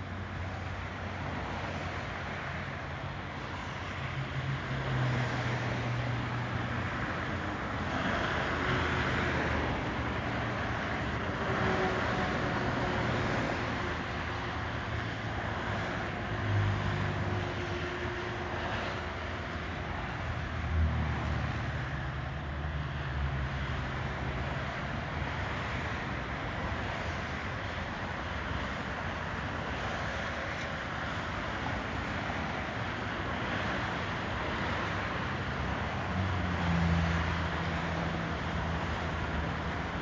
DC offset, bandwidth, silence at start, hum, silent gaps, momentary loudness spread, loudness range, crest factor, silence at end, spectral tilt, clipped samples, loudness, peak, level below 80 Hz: under 0.1%; 7.6 kHz; 0 s; none; none; 6 LU; 4 LU; 16 dB; 0 s; -6 dB/octave; under 0.1%; -34 LUFS; -18 dBFS; -42 dBFS